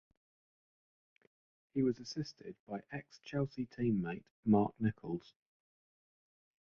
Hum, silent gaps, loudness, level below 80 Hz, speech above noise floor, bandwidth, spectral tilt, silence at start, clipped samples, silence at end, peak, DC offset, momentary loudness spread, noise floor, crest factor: none; 2.60-2.67 s, 4.31-4.43 s; -38 LUFS; -68 dBFS; over 53 dB; 7 kHz; -7 dB/octave; 1.75 s; under 0.1%; 1.5 s; -18 dBFS; under 0.1%; 15 LU; under -90 dBFS; 22 dB